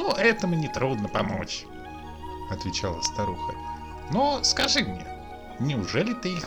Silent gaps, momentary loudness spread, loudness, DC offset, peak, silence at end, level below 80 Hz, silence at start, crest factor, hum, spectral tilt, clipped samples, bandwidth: none; 17 LU; -26 LUFS; under 0.1%; -8 dBFS; 0 s; -46 dBFS; 0 s; 20 dB; none; -4 dB/octave; under 0.1%; over 20 kHz